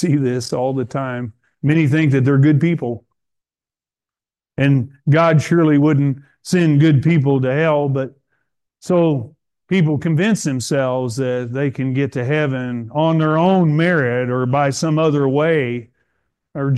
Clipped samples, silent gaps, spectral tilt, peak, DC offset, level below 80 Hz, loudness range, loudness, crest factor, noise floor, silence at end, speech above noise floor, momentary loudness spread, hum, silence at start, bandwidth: under 0.1%; none; -7 dB/octave; -2 dBFS; under 0.1%; -58 dBFS; 4 LU; -17 LUFS; 14 dB; under -90 dBFS; 0 s; over 74 dB; 11 LU; none; 0 s; 12 kHz